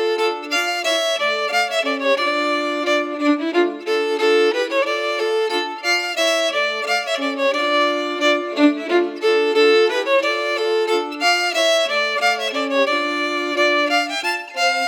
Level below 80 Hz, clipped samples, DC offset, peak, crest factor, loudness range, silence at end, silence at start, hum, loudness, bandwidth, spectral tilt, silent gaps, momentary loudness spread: -90 dBFS; under 0.1%; under 0.1%; -4 dBFS; 16 dB; 2 LU; 0 s; 0 s; none; -18 LUFS; 18.5 kHz; -0.5 dB/octave; none; 4 LU